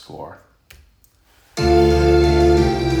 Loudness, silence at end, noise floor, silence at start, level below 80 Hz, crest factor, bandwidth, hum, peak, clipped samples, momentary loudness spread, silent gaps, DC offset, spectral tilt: -15 LUFS; 0 s; -55 dBFS; 0.1 s; -26 dBFS; 14 dB; 13.5 kHz; none; -2 dBFS; under 0.1%; 20 LU; none; under 0.1%; -7 dB/octave